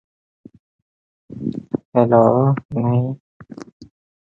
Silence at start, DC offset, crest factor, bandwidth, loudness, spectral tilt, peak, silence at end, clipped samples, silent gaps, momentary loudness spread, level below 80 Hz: 1.3 s; under 0.1%; 20 dB; 7.2 kHz; -18 LUFS; -11 dB/octave; 0 dBFS; 0.45 s; under 0.1%; 1.85-1.92 s, 2.65-2.69 s, 3.20-3.40 s, 3.72-3.80 s; 25 LU; -56 dBFS